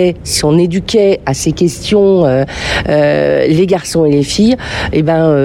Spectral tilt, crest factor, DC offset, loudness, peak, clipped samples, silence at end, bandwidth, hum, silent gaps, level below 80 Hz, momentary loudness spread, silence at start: -5.5 dB/octave; 10 dB; under 0.1%; -11 LUFS; 0 dBFS; under 0.1%; 0 s; 17.5 kHz; none; none; -32 dBFS; 5 LU; 0 s